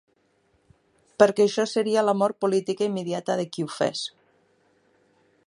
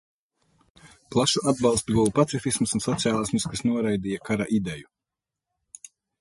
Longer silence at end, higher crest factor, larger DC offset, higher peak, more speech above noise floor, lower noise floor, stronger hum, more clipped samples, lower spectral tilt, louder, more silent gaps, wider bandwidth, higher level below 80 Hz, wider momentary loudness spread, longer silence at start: about the same, 1.4 s vs 1.4 s; about the same, 22 dB vs 20 dB; neither; first, -2 dBFS vs -6 dBFS; second, 43 dB vs 63 dB; second, -66 dBFS vs -87 dBFS; neither; neither; about the same, -5 dB/octave vs -4.5 dB/octave; about the same, -24 LUFS vs -24 LUFS; neither; about the same, 11.5 kHz vs 11.5 kHz; second, -72 dBFS vs -52 dBFS; about the same, 10 LU vs 11 LU; first, 1.2 s vs 0.85 s